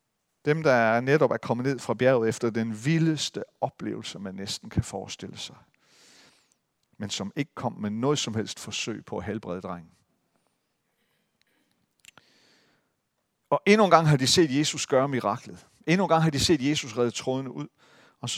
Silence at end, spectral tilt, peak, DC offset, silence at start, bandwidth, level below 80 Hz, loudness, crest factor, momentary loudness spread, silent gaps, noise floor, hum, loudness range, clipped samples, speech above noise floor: 0 s; -5 dB/octave; 0 dBFS; under 0.1%; 0.45 s; 15.5 kHz; -56 dBFS; -26 LUFS; 26 dB; 16 LU; none; -77 dBFS; none; 13 LU; under 0.1%; 52 dB